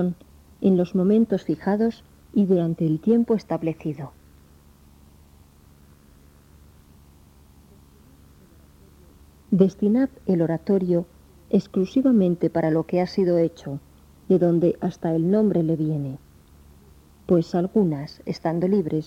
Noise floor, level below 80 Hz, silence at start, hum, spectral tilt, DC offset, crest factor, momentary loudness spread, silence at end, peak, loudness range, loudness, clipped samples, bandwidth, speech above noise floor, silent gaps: -52 dBFS; -54 dBFS; 0 s; none; -9.5 dB/octave; under 0.1%; 18 dB; 12 LU; 0.05 s; -6 dBFS; 6 LU; -22 LUFS; under 0.1%; 8 kHz; 31 dB; none